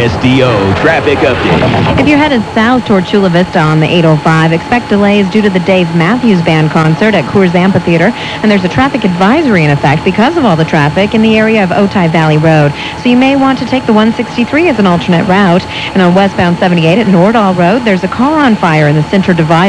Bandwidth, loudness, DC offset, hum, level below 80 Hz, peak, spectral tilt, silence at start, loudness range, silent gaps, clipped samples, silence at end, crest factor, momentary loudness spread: 11 kHz; -8 LUFS; under 0.1%; none; -34 dBFS; 0 dBFS; -7 dB/octave; 0 s; 1 LU; none; 1%; 0 s; 8 dB; 3 LU